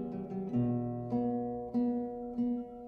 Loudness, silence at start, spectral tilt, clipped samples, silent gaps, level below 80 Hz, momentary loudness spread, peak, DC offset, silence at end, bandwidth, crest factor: -35 LUFS; 0 s; -11.5 dB/octave; under 0.1%; none; -62 dBFS; 5 LU; -22 dBFS; under 0.1%; 0 s; 3.1 kHz; 12 dB